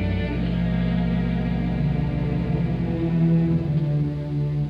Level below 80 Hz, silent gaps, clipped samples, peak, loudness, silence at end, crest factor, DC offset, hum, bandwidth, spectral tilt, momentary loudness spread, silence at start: -34 dBFS; none; under 0.1%; -10 dBFS; -23 LUFS; 0 s; 12 dB; 0.1%; none; 5.2 kHz; -10 dB/octave; 5 LU; 0 s